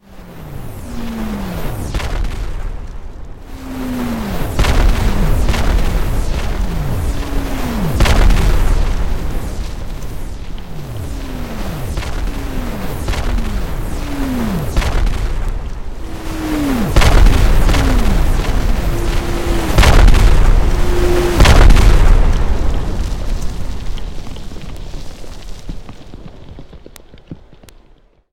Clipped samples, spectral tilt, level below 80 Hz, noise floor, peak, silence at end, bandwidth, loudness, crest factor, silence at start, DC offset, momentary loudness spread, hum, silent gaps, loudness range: under 0.1%; -5.5 dB/octave; -14 dBFS; -48 dBFS; 0 dBFS; 0 s; 16.5 kHz; -17 LUFS; 14 dB; 0 s; 2%; 20 LU; none; none; 14 LU